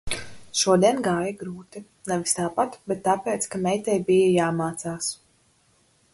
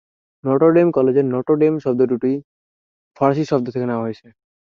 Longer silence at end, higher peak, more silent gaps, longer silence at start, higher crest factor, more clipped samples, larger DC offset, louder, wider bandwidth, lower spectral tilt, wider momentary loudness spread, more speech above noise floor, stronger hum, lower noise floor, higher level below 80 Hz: first, 1 s vs 0.55 s; second, -6 dBFS vs -2 dBFS; second, none vs 2.44-3.11 s; second, 0.05 s vs 0.45 s; about the same, 20 dB vs 16 dB; neither; neither; second, -24 LUFS vs -18 LUFS; first, 12 kHz vs 7.2 kHz; second, -4.5 dB/octave vs -9 dB/octave; first, 17 LU vs 12 LU; second, 39 dB vs over 73 dB; neither; second, -63 dBFS vs under -90 dBFS; first, -54 dBFS vs -62 dBFS